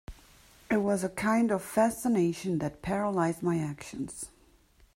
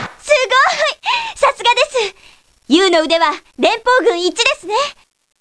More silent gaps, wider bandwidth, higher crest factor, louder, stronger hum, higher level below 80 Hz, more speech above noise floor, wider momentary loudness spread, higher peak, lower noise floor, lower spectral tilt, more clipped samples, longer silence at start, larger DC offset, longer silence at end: neither; first, 16 kHz vs 11 kHz; about the same, 18 dB vs 16 dB; second, -30 LUFS vs -14 LUFS; neither; about the same, -56 dBFS vs -52 dBFS; about the same, 33 dB vs 33 dB; first, 12 LU vs 7 LU; second, -12 dBFS vs 0 dBFS; first, -62 dBFS vs -47 dBFS; first, -6 dB/octave vs -1.5 dB/octave; neither; about the same, 0.1 s vs 0 s; second, under 0.1% vs 0.2%; first, 0.7 s vs 0.5 s